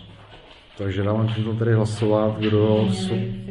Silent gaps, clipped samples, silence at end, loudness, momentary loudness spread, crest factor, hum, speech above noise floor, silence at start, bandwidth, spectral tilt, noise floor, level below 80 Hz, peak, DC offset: none; under 0.1%; 0 s; -22 LUFS; 7 LU; 16 dB; none; 25 dB; 0 s; 11 kHz; -7.5 dB/octave; -46 dBFS; -46 dBFS; -6 dBFS; under 0.1%